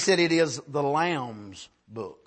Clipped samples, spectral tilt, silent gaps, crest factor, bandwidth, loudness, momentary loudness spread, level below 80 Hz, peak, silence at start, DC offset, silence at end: under 0.1%; -4 dB/octave; none; 18 dB; 8.8 kHz; -25 LUFS; 21 LU; -70 dBFS; -8 dBFS; 0 s; under 0.1%; 0.15 s